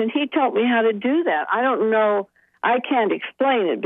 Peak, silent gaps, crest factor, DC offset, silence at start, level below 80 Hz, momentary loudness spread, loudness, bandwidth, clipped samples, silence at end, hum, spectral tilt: -8 dBFS; none; 12 dB; under 0.1%; 0 s; -78 dBFS; 5 LU; -20 LUFS; 3.9 kHz; under 0.1%; 0 s; none; -8 dB/octave